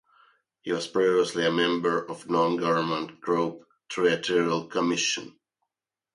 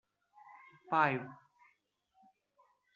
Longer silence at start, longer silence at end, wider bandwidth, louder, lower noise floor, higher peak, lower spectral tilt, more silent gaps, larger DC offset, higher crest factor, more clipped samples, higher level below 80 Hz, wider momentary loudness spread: second, 0.65 s vs 0.9 s; second, 0.85 s vs 1.6 s; first, 11.5 kHz vs 7.2 kHz; first, -26 LUFS vs -33 LUFS; first, -88 dBFS vs -76 dBFS; first, -10 dBFS vs -14 dBFS; about the same, -4 dB/octave vs -4 dB/octave; neither; neither; second, 18 dB vs 26 dB; neither; first, -72 dBFS vs -86 dBFS; second, 8 LU vs 26 LU